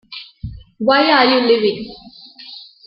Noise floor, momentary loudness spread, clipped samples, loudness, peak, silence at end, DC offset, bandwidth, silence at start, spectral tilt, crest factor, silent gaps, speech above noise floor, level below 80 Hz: -39 dBFS; 22 LU; under 0.1%; -14 LUFS; -2 dBFS; 0.25 s; under 0.1%; 5.8 kHz; 0.1 s; -8 dB/octave; 16 dB; none; 25 dB; -46 dBFS